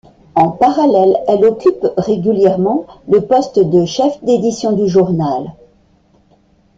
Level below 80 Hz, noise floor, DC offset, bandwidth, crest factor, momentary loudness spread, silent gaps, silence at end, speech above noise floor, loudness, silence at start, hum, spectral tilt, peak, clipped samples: -50 dBFS; -52 dBFS; under 0.1%; 7.8 kHz; 12 dB; 6 LU; none; 1.25 s; 39 dB; -13 LUFS; 0.35 s; none; -7 dB/octave; -2 dBFS; under 0.1%